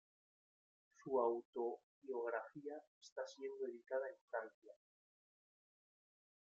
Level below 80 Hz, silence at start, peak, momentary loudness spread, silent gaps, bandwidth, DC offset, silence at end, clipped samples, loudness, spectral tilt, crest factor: under -90 dBFS; 1 s; -26 dBFS; 15 LU; 1.45-1.53 s, 1.83-2.02 s, 2.87-3.01 s, 3.12-3.16 s, 4.21-4.28 s, 4.54-4.62 s; 7.6 kHz; under 0.1%; 1.75 s; under 0.1%; -46 LUFS; -3.5 dB/octave; 22 dB